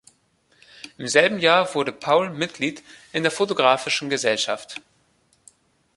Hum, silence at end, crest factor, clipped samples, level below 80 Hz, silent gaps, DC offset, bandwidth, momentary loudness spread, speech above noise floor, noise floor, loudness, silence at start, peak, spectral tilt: none; 1.15 s; 22 dB; under 0.1%; -68 dBFS; none; under 0.1%; 11.5 kHz; 19 LU; 42 dB; -63 dBFS; -21 LUFS; 0.85 s; 0 dBFS; -3 dB/octave